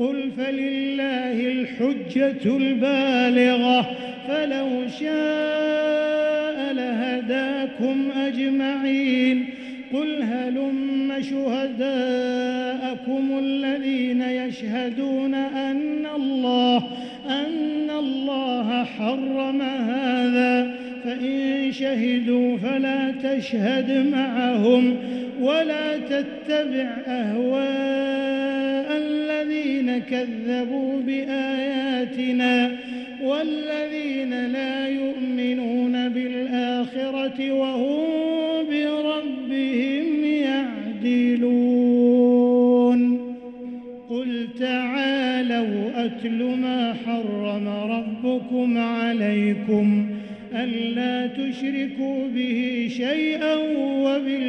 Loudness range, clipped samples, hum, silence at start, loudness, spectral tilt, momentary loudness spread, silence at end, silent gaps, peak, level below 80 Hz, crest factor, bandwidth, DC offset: 4 LU; under 0.1%; none; 0 s; -23 LUFS; -6 dB/octave; 7 LU; 0 s; none; -6 dBFS; -68 dBFS; 16 dB; 6.4 kHz; under 0.1%